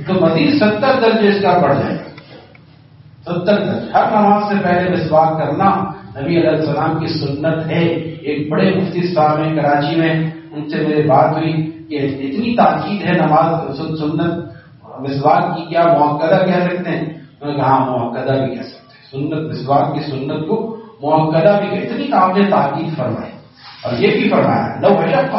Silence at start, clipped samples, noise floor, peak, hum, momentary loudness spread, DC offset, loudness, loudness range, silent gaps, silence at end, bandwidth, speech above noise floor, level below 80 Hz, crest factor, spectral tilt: 0 s; under 0.1%; -43 dBFS; 0 dBFS; none; 11 LU; under 0.1%; -15 LUFS; 3 LU; none; 0 s; 5.8 kHz; 29 dB; -54 dBFS; 16 dB; -5.5 dB/octave